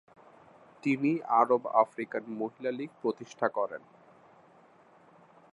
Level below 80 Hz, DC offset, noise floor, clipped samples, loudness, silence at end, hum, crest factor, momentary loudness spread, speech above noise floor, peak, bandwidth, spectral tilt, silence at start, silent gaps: -86 dBFS; under 0.1%; -60 dBFS; under 0.1%; -30 LUFS; 1.75 s; none; 24 dB; 11 LU; 30 dB; -8 dBFS; 10.5 kHz; -7 dB/octave; 0.85 s; none